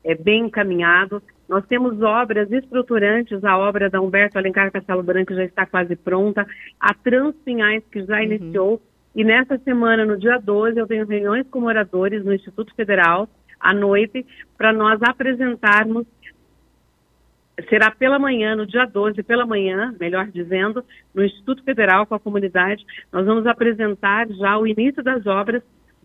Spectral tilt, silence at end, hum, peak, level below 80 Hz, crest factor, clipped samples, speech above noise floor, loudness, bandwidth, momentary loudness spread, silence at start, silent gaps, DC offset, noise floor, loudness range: -7 dB/octave; 0.45 s; none; 0 dBFS; -58 dBFS; 18 dB; under 0.1%; 42 dB; -18 LUFS; 6.8 kHz; 9 LU; 0.05 s; none; under 0.1%; -60 dBFS; 2 LU